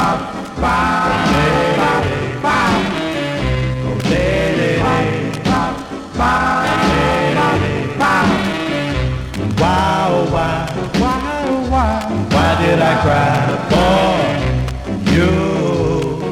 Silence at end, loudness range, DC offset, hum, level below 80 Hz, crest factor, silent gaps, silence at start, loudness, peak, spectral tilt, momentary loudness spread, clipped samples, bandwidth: 0 s; 2 LU; under 0.1%; none; -30 dBFS; 14 dB; none; 0 s; -16 LUFS; -2 dBFS; -6 dB/octave; 6 LU; under 0.1%; 15.5 kHz